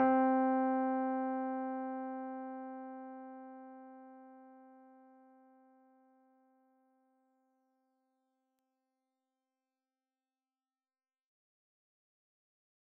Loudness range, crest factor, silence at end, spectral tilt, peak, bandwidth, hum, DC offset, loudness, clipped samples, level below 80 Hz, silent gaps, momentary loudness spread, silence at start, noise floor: 24 LU; 22 dB; 8.05 s; -5 dB/octave; -20 dBFS; 3 kHz; none; under 0.1%; -36 LUFS; under 0.1%; under -90 dBFS; none; 24 LU; 0 s; under -90 dBFS